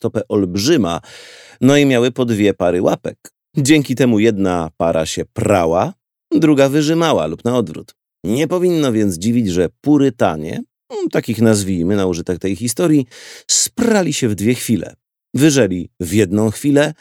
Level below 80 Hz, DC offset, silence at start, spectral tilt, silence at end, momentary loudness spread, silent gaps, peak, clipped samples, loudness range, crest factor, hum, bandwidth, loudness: -48 dBFS; under 0.1%; 0.05 s; -5 dB/octave; 0.1 s; 10 LU; none; 0 dBFS; under 0.1%; 2 LU; 16 dB; none; 17.5 kHz; -16 LUFS